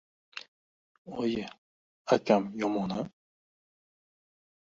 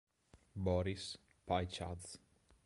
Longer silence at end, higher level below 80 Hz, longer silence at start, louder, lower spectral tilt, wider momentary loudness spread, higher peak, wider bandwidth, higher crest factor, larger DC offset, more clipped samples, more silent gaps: first, 1.6 s vs 0.5 s; second, -70 dBFS vs -54 dBFS; about the same, 0.35 s vs 0.35 s; first, -30 LUFS vs -41 LUFS; about the same, -6 dB/octave vs -5.5 dB/octave; first, 20 LU vs 16 LU; first, -10 dBFS vs -22 dBFS; second, 7.8 kHz vs 11.5 kHz; about the same, 24 dB vs 22 dB; neither; neither; first, 0.48-1.05 s, 1.58-2.05 s vs none